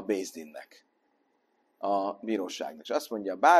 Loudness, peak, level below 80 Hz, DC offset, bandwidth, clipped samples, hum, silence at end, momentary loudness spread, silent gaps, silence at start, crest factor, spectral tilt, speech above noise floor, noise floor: -32 LUFS; -8 dBFS; -78 dBFS; under 0.1%; 13 kHz; under 0.1%; none; 0 s; 13 LU; none; 0 s; 22 dB; -3.5 dB/octave; 44 dB; -72 dBFS